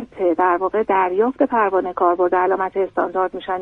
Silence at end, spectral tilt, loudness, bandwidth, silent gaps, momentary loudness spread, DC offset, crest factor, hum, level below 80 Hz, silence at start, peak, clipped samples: 0 s; -8 dB/octave; -19 LUFS; 4 kHz; none; 4 LU; under 0.1%; 14 dB; none; -56 dBFS; 0 s; -4 dBFS; under 0.1%